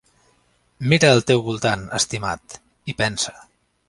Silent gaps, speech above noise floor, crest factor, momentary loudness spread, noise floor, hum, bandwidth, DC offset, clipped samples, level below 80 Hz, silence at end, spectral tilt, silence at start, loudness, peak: none; 42 dB; 22 dB; 15 LU; -62 dBFS; none; 11.5 kHz; under 0.1%; under 0.1%; -50 dBFS; 0.45 s; -4 dB/octave; 0.8 s; -20 LUFS; 0 dBFS